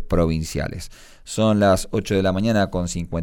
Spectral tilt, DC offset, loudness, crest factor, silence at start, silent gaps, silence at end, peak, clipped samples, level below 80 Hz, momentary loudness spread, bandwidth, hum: -6 dB/octave; under 0.1%; -21 LUFS; 14 dB; 0 s; none; 0 s; -6 dBFS; under 0.1%; -34 dBFS; 13 LU; 17.5 kHz; none